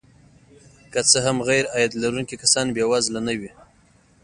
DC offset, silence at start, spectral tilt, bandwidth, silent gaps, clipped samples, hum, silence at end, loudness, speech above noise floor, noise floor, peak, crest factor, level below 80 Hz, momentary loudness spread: under 0.1%; 0.9 s; -2.5 dB/octave; 11.5 kHz; none; under 0.1%; none; 0.75 s; -20 LUFS; 35 dB; -56 dBFS; 0 dBFS; 22 dB; -56 dBFS; 11 LU